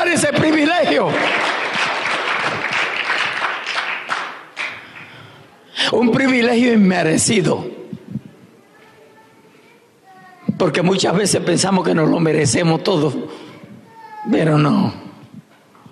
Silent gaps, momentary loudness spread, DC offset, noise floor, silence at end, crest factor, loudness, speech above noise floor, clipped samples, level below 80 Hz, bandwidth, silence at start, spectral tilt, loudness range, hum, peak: none; 17 LU; under 0.1%; -49 dBFS; 0.5 s; 12 dB; -17 LUFS; 34 dB; under 0.1%; -60 dBFS; 13 kHz; 0 s; -4.5 dB/octave; 6 LU; none; -6 dBFS